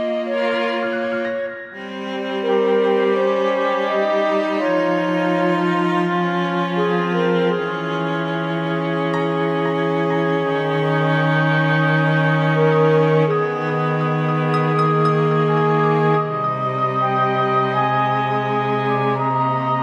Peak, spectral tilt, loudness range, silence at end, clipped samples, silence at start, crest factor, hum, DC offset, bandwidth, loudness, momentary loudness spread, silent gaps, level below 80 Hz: -4 dBFS; -8 dB/octave; 3 LU; 0 s; under 0.1%; 0 s; 14 dB; none; under 0.1%; 7.6 kHz; -19 LUFS; 5 LU; none; -66 dBFS